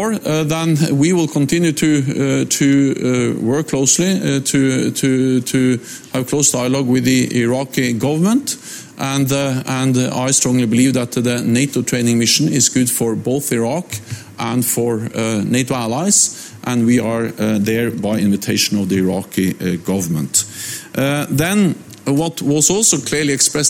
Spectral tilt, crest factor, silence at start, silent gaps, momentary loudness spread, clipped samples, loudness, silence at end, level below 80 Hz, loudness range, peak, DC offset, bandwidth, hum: -4 dB/octave; 14 dB; 0 s; none; 7 LU; under 0.1%; -16 LUFS; 0 s; -52 dBFS; 3 LU; -2 dBFS; under 0.1%; 17 kHz; none